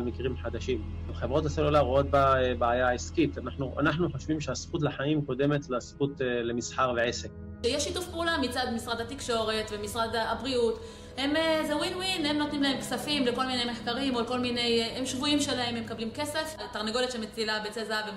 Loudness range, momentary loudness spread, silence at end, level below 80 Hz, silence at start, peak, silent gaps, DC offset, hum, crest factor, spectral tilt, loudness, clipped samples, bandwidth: 3 LU; 8 LU; 0 s; -46 dBFS; 0 s; -14 dBFS; none; under 0.1%; none; 16 dB; -4.5 dB/octave; -29 LUFS; under 0.1%; 16 kHz